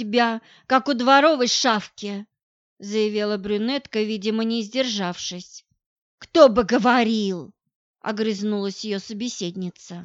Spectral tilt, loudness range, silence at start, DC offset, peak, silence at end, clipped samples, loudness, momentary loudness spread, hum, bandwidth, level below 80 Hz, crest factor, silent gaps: -4 dB/octave; 4 LU; 0 s; under 0.1%; 0 dBFS; 0 s; under 0.1%; -21 LUFS; 17 LU; none; 8 kHz; -58 dBFS; 22 dB; 2.43-2.77 s, 5.86-6.18 s, 7.75-7.94 s